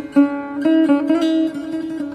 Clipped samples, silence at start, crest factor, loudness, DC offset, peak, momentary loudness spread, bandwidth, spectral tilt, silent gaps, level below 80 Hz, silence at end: under 0.1%; 0 s; 14 dB; -18 LUFS; under 0.1%; -2 dBFS; 10 LU; 9.8 kHz; -6 dB/octave; none; -60 dBFS; 0 s